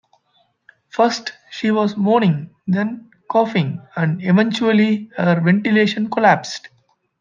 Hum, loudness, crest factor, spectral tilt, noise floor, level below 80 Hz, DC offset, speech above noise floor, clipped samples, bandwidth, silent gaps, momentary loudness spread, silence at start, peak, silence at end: none; -18 LUFS; 16 dB; -6.5 dB/octave; -62 dBFS; -68 dBFS; under 0.1%; 45 dB; under 0.1%; 7.4 kHz; none; 10 LU; 0.95 s; -2 dBFS; 0.55 s